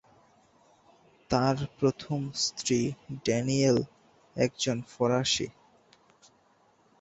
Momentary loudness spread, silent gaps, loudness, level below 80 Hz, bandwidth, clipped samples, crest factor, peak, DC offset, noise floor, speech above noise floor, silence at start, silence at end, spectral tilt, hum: 9 LU; none; -29 LUFS; -60 dBFS; 8.2 kHz; under 0.1%; 20 dB; -10 dBFS; under 0.1%; -65 dBFS; 37 dB; 1.3 s; 1.5 s; -4.5 dB/octave; none